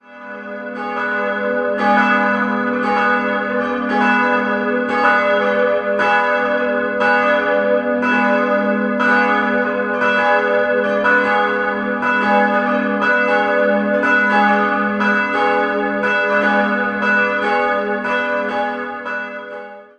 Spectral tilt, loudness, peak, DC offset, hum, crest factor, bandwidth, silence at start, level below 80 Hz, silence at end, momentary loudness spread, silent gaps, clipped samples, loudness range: -6 dB/octave; -16 LUFS; -2 dBFS; under 0.1%; none; 16 dB; 8.8 kHz; 0.1 s; -56 dBFS; 0.15 s; 6 LU; none; under 0.1%; 2 LU